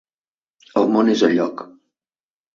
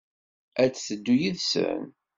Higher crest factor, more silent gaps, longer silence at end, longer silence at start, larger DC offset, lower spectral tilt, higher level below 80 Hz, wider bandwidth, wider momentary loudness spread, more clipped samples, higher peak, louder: about the same, 18 dB vs 18 dB; neither; first, 0.9 s vs 0.25 s; first, 0.75 s vs 0.55 s; neither; about the same, -5.5 dB/octave vs -4.5 dB/octave; about the same, -66 dBFS vs -66 dBFS; about the same, 7.4 kHz vs 7.8 kHz; about the same, 10 LU vs 9 LU; neither; first, -2 dBFS vs -8 dBFS; first, -18 LUFS vs -26 LUFS